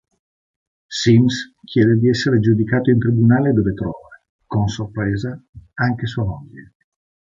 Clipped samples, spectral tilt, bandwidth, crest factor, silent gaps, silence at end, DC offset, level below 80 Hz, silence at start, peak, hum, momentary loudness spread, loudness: under 0.1%; -7 dB/octave; 7.6 kHz; 16 dB; 4.29-4.39 s, 5.49-5.53 s; 0.75 s; under 0.1%; -44 dBFS; 0.9 s; -2 dBFS; none; 14 LU; -18 LUFS